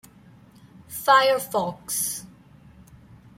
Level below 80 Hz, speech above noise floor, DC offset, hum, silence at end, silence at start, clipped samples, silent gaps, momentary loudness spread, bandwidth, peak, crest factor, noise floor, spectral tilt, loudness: -60 dBFS; 30 dB; under 0.1%; none; 1.1 s; 0.9 s; under 0.1%; none; 14 LU; 16.5 kHz; -6 dBFS; 20 dB; -51 dBFS; -2 dB/octave; -22 LUFS